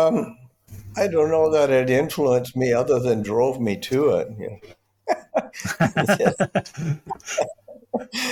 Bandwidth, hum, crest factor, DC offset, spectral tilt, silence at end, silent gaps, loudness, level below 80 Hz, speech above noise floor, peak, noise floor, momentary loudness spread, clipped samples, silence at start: 18.5 kHz; none; 18 dB; under 0.1%; -5.5 dB/octave; 0 s; none; -22 LUFS; -56 dBFS; 21 dB; -4 dBFS; -42 dBFS; 12 LU; under 0.1%; 0 s